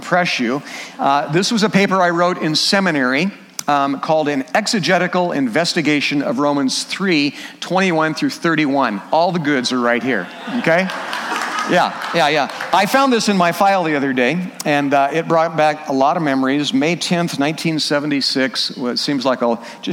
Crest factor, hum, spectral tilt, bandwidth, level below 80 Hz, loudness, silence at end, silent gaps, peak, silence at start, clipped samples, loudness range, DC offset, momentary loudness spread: 16 dB; none; -4.5 dB/octave; 17 kHz; -66 dBFS; -17 LUFS; 0 s; none; -2 dBFS; 0 s; under 0.1%; 2 LU; under 0.1%; 6 LU